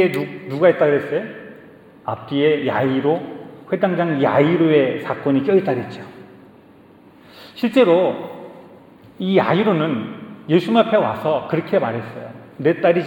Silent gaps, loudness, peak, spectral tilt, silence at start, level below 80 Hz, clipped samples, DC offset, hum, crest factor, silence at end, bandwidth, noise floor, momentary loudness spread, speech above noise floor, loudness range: none; -18 LUFS; -2 dBFS; -8 dB/octave; 0 s; -66 dBFS; under 0.1%; under 0.1%; none; 18 dB; 0 s; 17.5 kHz; -47 dBFS; 19 LU; 29 dB; 3 LU